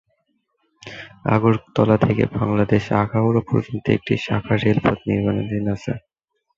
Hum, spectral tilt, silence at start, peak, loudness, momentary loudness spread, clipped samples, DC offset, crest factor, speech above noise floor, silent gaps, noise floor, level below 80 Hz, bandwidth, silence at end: none; -8.5 dB/octave; 0.85 s; -2 dBFS; -20 LUFS; 10 LU; under 0.1%; under 0.1%; 18 dB; 50 dB; none; -69 dBFS; -46 dBFS; 7.4 kHz; 0.6 s